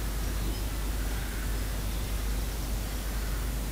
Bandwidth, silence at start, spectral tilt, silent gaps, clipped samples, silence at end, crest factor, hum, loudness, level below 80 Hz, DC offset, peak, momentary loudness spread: 16 kHz; 0 s; -4.5 dB/octave; none; under 0.1%; 0 s; 10 dB; none; -34 LUFS; -32 dBFS; under 0.1%; -20 dBFS; 1 LU